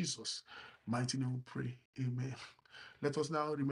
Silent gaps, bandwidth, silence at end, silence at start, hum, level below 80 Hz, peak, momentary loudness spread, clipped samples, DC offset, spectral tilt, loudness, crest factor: 1.85-1.93 s; 11.5 kHz; 0 s; 0 s; none; -76 dBFS; -22 dBFS; 16 LU; under 0.1%; under 0.1%; -5 dB/octave; -40 LUFS; 18 dB